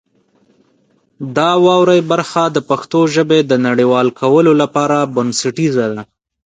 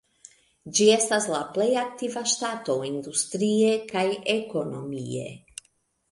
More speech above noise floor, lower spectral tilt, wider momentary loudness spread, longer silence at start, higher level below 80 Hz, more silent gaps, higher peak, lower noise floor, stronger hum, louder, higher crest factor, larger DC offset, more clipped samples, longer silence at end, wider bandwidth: about the same, 45 dB vs 43 dB; first, -5.5 dB/octave vs -3 dB/octave; second, 7 LU vs 13 LU; first, 1.2 s vs 0.65 s; first, -60 dBFS vs -68 dBFS; neither; first, 0 dBFS vs -6 dBFS; second, -57 dBFS vs -68 dBFS; neither; first, -13 LUFS vs -25 LUFS; second, 14 dB vs 20 dB; neither; neither; second, 0.45 s vs 0.75 s; second, 9.4 kHz vs 11.5 kHz